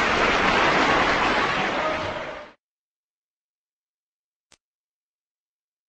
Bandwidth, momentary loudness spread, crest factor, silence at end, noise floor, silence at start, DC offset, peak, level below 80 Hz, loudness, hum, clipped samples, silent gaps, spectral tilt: 8.8 kHz; 13 LU; 18 dB; 3.4 s; under -90 dBFS; 0 s; under 0.1%; -6 dBFS; -46 dBFS; -20 LUFS; none; under 0.1%; none; -3.5 dB/octave